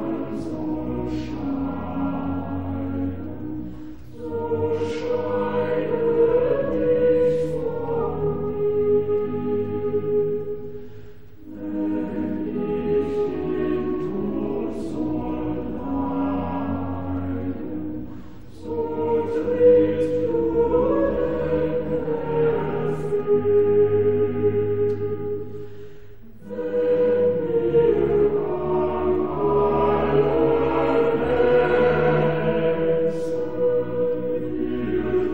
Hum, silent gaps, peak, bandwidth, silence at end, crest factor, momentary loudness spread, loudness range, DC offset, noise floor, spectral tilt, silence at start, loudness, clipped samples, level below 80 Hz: none; none; -6 dBFS; 6.2 kHz; 0 s; 16 dB; 12 LU; 7 LU; 2%; -45 dBFS; -9 dB/octave; 0 s; -23 LUFS; under 0.1%; -44 dBFS